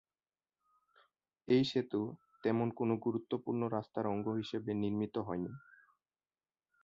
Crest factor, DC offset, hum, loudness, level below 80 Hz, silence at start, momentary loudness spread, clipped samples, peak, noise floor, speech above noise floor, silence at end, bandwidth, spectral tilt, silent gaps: 20 dB; under 0.1%; none; -37 LUFS; -72 dBFS; 1.45 s; 8 LU; under 0.1%; -18 dBFS; under -90 dBFS; over 55 dB; 1.25 s; 7.4 kHz; -6 dB/octave; none